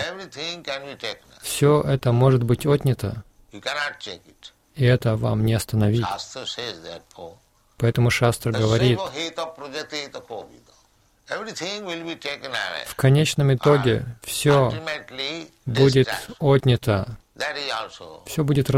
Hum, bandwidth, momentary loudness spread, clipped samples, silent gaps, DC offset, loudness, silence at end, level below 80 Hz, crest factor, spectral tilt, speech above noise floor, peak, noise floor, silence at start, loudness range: none; 16 kHz; 16 LU; under 0.1%; none; under 0.1%; -22 LUFS; 0 s; -48 dBFS; 18 dB; -6 dB/octave; 38 dB; -4 dBFS; -60 dBFS; 0 s; 5 LU